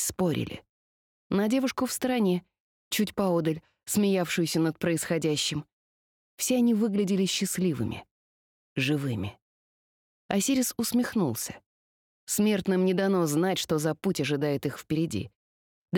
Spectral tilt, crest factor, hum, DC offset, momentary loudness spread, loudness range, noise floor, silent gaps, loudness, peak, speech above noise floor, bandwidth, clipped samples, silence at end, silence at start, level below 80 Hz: -4.5 dB/octave; 18 dB; none; under 0.1%; 10 LU; 3 LU; under -90 dBFS; 0.69-1.30 s, 2.60-2.91 s, 5.72-6.38 s, 8.11-8.76 s, 9.42-10.29 s, 11.66-12.27 s, 15.36-15.88 s; -27 LUFS; -10 dBFS; over 63 dB; 19 kHz; under 0.1%; 0 s; 0 s; -62 dBFS